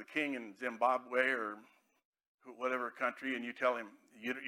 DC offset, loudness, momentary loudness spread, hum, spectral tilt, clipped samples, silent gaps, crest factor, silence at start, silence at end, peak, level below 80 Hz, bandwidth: under 0.1%; -36 LUFS; 11 LU; none; -4 dB/octave; under 0.1%; 2.05-2.13 s, 2.27-2.38 s; 20 dB; 0 s; 0 s; -18 dBFS; under -90 dBFS; 16 kHz